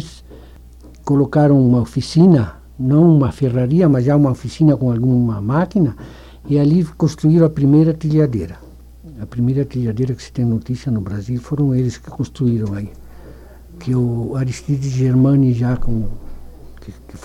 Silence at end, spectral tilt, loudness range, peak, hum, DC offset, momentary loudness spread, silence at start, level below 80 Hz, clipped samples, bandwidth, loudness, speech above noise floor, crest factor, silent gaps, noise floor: 0.05 s; -9 dB/octave; 7 LU; -2 dBFS; none; under 0.1%; 13 LU; 0 s; -36 dBFS; under 0.1%; 10.5 kHz; -16 LUFS; 24 dB; 14 dB; none; -40 dBFS